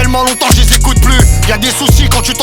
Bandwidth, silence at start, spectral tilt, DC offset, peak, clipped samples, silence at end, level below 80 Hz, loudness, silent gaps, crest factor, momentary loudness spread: 19 kHz; 0 s; -3.5 dB/octave; under 0.1%; 0 dBFS; 0.5%; 0 s; -10 dBFS; -9 LUFS; none; 8 dB; 3 LU